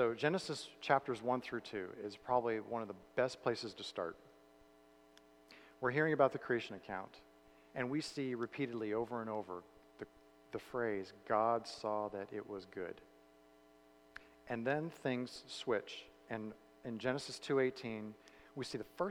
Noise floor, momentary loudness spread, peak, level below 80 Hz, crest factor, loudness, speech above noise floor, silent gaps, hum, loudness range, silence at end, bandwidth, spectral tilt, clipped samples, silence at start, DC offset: -65 dBFS; 17 LU; -16 dBFS; -76 dBFS; 24 dB; -40 LUFS; 26 dB; none; none; 4 LU; 0 s; 16 kHz; -5.5 dB/octave; under 0.1%; 0 s; under 0.1%